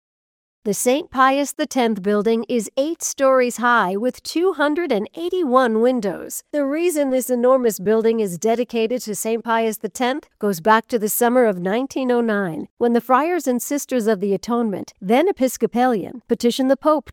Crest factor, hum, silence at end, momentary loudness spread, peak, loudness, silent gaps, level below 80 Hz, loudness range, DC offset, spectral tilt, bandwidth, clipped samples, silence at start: 16 dB; none; 0 s; 7 LU; -2 dBFS; -19 LUFS; 12.71-12.77 s; -62 dBFS; 2 LU; under 0.1%; -4 dB/octave; 17.5 kHz; under 0.1%; 0.65 s